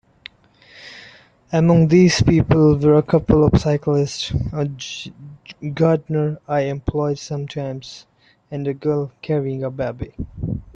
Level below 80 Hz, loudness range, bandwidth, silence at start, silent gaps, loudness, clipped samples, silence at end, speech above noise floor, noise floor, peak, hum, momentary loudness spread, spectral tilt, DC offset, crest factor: -38 dBFS; 9 LU; 8.4 kHz; 0.75 s; none; -19 LUFS; under 0.1%; 0.15 s; 32 dB; -50 dBFS; -2 dBFS; none; 18 LU; -7 dB/octave; under 0.1%; 16 dB